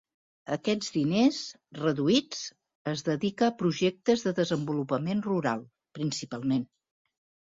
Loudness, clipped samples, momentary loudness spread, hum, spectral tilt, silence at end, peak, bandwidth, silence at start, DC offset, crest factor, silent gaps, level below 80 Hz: -29 LUFS; under 0.1%; 12 LU; none; -5.5 dB/octave; 0.9 s; -12 dBFS; 7.8 kHz; 0.45 s; under 0.1%; 18 dB; 2.75-2.85 s; -68 dBFS